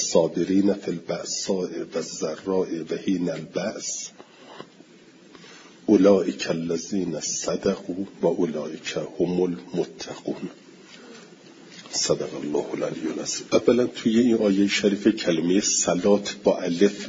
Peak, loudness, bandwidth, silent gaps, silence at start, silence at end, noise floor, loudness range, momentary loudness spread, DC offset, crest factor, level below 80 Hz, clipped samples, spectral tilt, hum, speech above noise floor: -4 dBFS; -24 LUFS; 7.8 kHz; none; 0 s; 0 s; -51 dBFS; 9 LU; 12 LU; under 0.1%; 20 dB; -62 dBFS; under 0.1%; -4 dB/octave; none; 27 dB